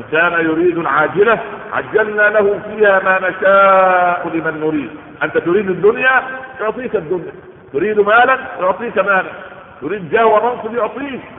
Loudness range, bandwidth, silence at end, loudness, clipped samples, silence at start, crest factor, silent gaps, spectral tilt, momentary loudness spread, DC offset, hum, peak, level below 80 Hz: 4 LU; 3.9 kHz; 0 s; -14 LUFS; under 0.1%; 0 s; 14 dB; none; -10 dB/octave; 13 LU; under 0.1%; none; 0 dBFS; -54 dBFS